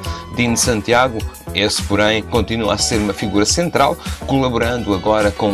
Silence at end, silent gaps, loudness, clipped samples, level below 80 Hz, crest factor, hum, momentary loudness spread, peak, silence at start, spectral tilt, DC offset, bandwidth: 0 s; none; -16 LUFS; under 0.1%; -32 dBFS; 16 dB; none; 5 LU; 0 dBFS; 0 s; -4 dB/octave; under 0.1%; 15.5 kHz